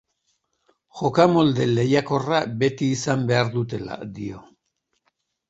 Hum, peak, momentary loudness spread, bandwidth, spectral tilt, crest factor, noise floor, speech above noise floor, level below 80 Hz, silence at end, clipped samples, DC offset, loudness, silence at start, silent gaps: none; -2 dBFS; 16 LU; 8.2 kHz; -6 dB/octave; 22 dB; -75 dBFS; 54 dB; -58 dBFS; 1.1 s; under 0.1%; under 0.1%; -21 LUFS; 0.95 s; none